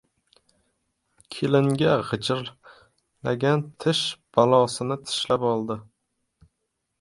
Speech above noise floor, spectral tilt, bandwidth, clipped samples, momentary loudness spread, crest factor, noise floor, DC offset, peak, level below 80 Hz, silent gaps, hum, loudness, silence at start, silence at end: 55 dB; -5.5 dB/octave; 11.5 kHz; under 0.1%; 12 LU; 22 dB; -78 dBFS; under 0.1%; -4 dBFS; -62 dBFS; none; none; -24 LUFS; 1.3 s; 1.2 s